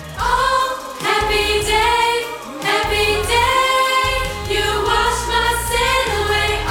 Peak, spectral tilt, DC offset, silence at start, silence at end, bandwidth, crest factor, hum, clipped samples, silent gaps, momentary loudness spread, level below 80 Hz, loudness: -4 dBFS; -2.5 dB/octave; under 0.1%; 0 s; 0 s; 19 kHz; 14 dB; none; under 0.1%; none; 5 LU; -30 dBFS; -16 LUFS